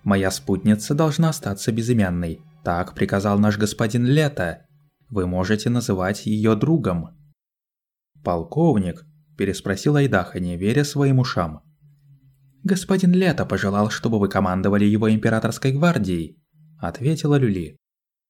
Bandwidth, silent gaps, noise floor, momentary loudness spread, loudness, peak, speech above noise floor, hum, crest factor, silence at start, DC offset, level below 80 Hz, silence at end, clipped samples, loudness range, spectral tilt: 16 kHz; none; -90 dBFS; 10 LU; -21 LUFS; -4 dBFS; 70 dB; none; 18 dB; 0.05 s; under 0.1%; -48 dBFS; 0.6 s; under 0.1%; 3 LU; -6.5 dB/octave